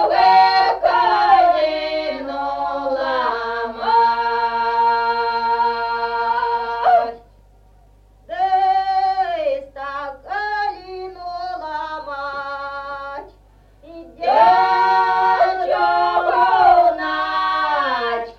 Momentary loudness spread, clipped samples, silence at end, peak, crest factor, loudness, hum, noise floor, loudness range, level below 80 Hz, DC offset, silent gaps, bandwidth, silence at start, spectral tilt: 15 LU; under 0.1%; 0.05 s; -2 dBFS; 16 dB; -18 LUFS; 50 Hz at -50 dBFS; -49 dBFS; 10 LU; -50 dBFS; under 0.1%; none; 6.8 kHz; 0 s; -4 dB/octave